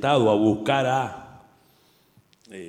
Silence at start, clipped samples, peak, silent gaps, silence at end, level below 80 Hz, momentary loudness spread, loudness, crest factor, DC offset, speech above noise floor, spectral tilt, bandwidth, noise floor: 0 s; under 0.1%; -6 dBFS; none; 0 s; -62 dBFS; 21 LU; -22 LUFS; 18 dB; under 0.1%; 40 dB; -6 dB/octave; 15.5 kHz; -60 dBFS